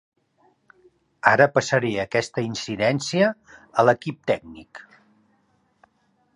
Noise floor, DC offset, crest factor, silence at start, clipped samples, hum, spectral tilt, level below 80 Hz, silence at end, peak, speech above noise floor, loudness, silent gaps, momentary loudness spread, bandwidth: -66 dBFS; under 0.1%; 24 dB; 1.25 s; under 0.1%; none; -5 dB/octave; -62 dBFS; 1.55 s; 0 dBFS; 44 dB; -22 LUFS; none; 14 LU; 11 kHz